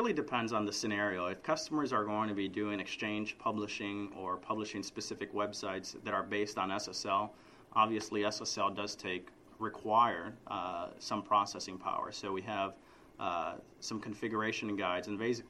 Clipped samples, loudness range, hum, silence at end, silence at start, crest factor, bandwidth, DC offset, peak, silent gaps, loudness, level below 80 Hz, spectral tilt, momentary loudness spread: under 0.1%; 4 LU; none; 0 s; 0 s; 22 dB; 13 kHz; under 0.1%; -16 dBFS; none; -36 LUFS; -72 dBFS; -4 dB/octave; 9 LU